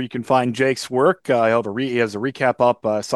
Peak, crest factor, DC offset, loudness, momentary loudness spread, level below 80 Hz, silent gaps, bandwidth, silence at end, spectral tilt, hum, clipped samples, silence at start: -4 dBFS; 16 dB; under 0.1%; -19 LUFS; 4 LU; -66 dBFS; none; 12.5 kHz; 0 s; -5.5 dB/octave; none; under 0.1%; 0 s